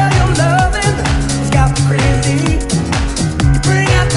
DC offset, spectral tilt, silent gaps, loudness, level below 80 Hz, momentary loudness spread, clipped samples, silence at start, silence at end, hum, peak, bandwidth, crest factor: under 0.1%; -5 dB/octave; none; -13 LUFS; -20 dBFS; 4 LU; under 0.1%; 0 s; 0 s; none; 0 dBFS; 11.5 kHz; 12 dB